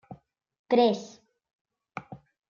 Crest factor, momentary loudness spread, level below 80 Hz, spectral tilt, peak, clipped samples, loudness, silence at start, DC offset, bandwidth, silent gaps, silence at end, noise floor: 22 dB; 20 LU; -74 dBFS; -5.5 dB/octave; -10 dBFS; under 0.1%; -25 LUFS; 0.1 s; under 0.1%; 7.2 kHz; 0.59-0.64 s, 1.53-1.65 s; 0.35 s; -44 dBFS